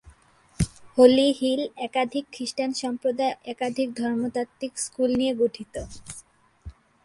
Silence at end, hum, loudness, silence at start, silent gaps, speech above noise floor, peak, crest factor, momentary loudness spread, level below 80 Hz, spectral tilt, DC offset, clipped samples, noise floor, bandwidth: 0.35 s; none; -25 LUFS; 0.05 s; none; 32 dB; -4 dBFS; 22 dB; 18 LU; -48 dBFS; -5 dB/octave; under 0.1%; under 0.1%; -56 dBFS; 11.5 kHz